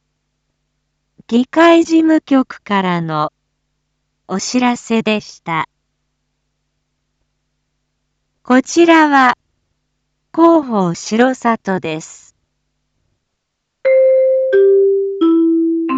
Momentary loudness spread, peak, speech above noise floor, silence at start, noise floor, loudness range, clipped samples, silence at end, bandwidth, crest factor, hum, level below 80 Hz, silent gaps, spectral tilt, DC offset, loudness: 12 LU; 0 dBFS; 60 dB; 1.3 s; -73 dBFS; 7 LU; under 0.1%; 0 s; 8 kHz; 14 dB; none; -62 dBFS; none; -5 dB/octave; under 0.1%; -13 LUFS